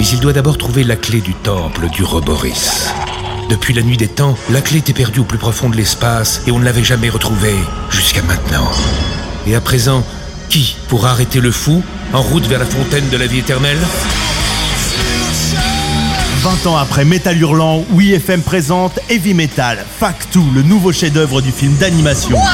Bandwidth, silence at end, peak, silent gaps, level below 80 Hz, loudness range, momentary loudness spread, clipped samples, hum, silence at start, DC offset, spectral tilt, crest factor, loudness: 17 kHz; 0 s; 0 dBFS; none; -24 dBFS; 2 LU; 5 LU; under 0.1%; none; 0 s; under 0.1%; -4.5 dB/octave; 12 dB; -13 LUFS